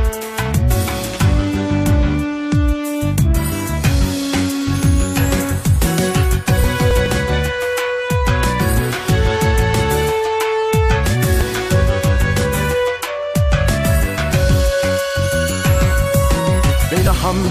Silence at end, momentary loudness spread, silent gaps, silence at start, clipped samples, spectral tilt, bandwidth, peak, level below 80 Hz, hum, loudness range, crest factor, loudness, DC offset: 0 s; 3 LU; none; 0 s; under 0.1%; -5.5 dB/octave; 15.5 kHz; -4 dBFS; -22 dBFS; none; 1 LU; 12 dB; -16 LUFS; under 0.1%